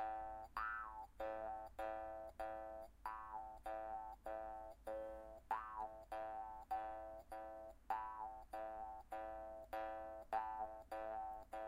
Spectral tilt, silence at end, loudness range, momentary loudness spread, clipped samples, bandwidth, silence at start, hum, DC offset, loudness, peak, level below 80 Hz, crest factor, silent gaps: -5.5 dB/octave; 0 s; 1 LU; 7 LU; under 0.1%; 16 kHz; 0 s; none; under 0.1%; -50 LUFS; -30 dBFS; -66 dBFS; 18 dB; none